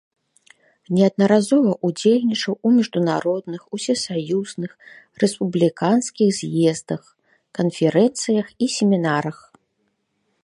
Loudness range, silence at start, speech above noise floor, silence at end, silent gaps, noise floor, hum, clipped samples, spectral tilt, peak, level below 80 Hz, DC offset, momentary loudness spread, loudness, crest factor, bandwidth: 3 LU; 0.9 s; 51 dB; 1.1 s; none; -70 dBFS; none; under 0.1%; -5.5 dB/octave; -4 dBFS; -68 dBFS; under 0.1%; 11 LU; -20 LUFS; 18 dB; 11.5 kHz